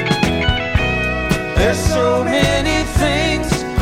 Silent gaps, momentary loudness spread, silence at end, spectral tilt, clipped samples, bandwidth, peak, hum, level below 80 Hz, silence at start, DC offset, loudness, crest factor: none; 3 LU; 0 s; -5 dB/octave; under 0.1%; 16.5 kHz; -2 dBFS; none; -24 dBFS; 0 s; under 0.1%; -16 LUFS; 14 dB